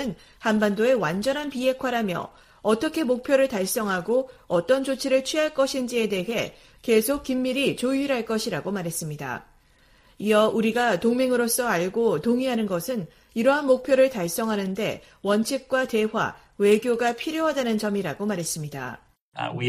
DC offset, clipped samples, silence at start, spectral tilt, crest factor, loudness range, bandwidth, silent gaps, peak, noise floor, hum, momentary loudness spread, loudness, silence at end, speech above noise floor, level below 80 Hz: under 0.1%; under 0.1%; 0 s; -4.5 dB/octave; 18 dB; 2 LU; 15.5 kHz; 19.21-19.32 s; -6 dBFS; -58 dBFS; none; 10 LU; -24 LUFS; 0 s; 34 dB; -58 dBFS